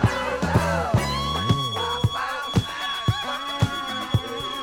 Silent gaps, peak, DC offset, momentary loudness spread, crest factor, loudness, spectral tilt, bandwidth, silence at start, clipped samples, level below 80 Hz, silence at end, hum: none; -4 dBFS; under 0.1%; 5 LU; 20 dB; -24 LUFS; -5 dB/octave; 18 kHz; 0 s; under 0.1%; -40 dBFS; 0 s; none